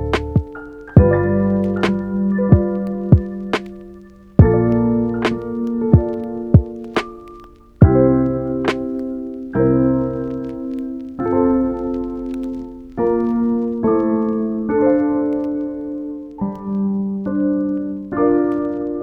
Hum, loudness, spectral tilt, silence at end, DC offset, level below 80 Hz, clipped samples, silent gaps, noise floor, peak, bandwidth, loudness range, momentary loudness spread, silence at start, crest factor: none; -18 LUFS; -9.5 dB/octave; 0 s; under 0.1%; -32 dBFS; under 0.1%; none; -41 dBFS; 0 dBFS; 8.6 kHz; 4 LU; 12 LU; 0 s; 18 dB